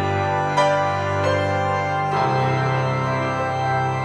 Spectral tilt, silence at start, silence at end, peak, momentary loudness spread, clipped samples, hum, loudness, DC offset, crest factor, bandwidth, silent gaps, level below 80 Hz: -6 dB/octave; 0 s; 0 s; -6 dBFS; 3 LU; under 0.1%; none; -21 LUFS; under 0.1%; 14 dB; 10 kHz; none; -54 dBFS